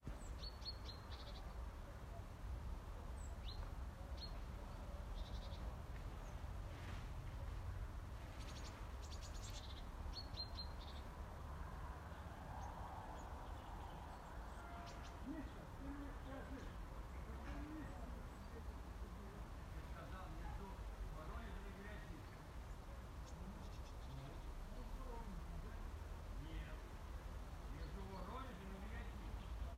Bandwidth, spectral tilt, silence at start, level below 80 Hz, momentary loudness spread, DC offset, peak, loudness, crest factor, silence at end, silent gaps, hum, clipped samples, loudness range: 16 kHz; -5.5 dB/octave; 0 s; -52 dBFS; 3 LU; under 0.1%; -36 dBFS; -53 LUFS; 14 dB; 0 s; none; none; under 0.1%; 2 LU